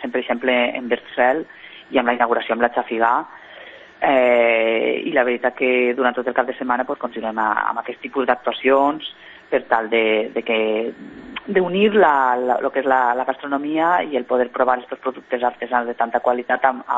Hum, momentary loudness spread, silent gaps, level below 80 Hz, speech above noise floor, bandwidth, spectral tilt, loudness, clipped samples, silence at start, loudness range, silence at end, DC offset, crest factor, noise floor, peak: none; 9 LU; none; -62 dBFS; 22 dB; 7.6 kHz; -7 dB/octave; -19 LUFS; under 0.1%; 0 s; 3 LU; 0 s; under 0.1%; 18 dB; -41 dBFS; -2 dBFS